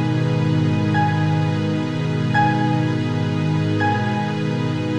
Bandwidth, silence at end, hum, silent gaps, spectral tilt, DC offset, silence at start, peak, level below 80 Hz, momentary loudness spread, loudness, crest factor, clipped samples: 8.8 kHz; 0 s; none; none; -7.5 dB/octave; under 0.1%; 0 s; -6 dBFS; -54 dBFS; 4 LU; -20 LUFS; 14 dB; under 0.1%